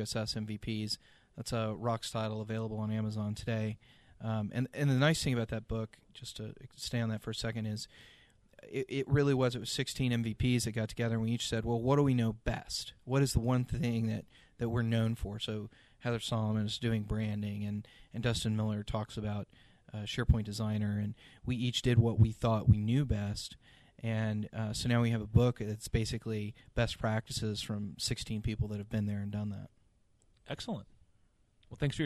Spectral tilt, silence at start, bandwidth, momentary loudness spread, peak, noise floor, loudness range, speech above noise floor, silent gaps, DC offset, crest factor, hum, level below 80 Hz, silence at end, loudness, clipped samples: -6 dB/octave; 0 s; 13 kHz; 13 LU; -12 dBFS; -69 dBFS; 6 LU; 35 dB; none; under 0.1%; 22 dB; none; -48 dBFS; 0 s; -34 LUFS; under 0.1%